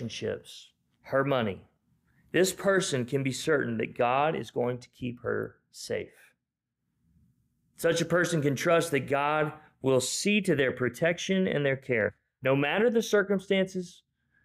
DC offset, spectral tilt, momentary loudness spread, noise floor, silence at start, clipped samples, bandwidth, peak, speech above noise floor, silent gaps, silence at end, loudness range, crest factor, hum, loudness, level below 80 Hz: under 0.1%; -4.5 dB/octave; 11 LU; -85 dBFS; 0 s; under 0.1%; 15.5 kHz; -14 dBFS; 57 dB; none; 0.55 s; 6 LU; 14 dB; none; -28 LUFS; -66 dBFS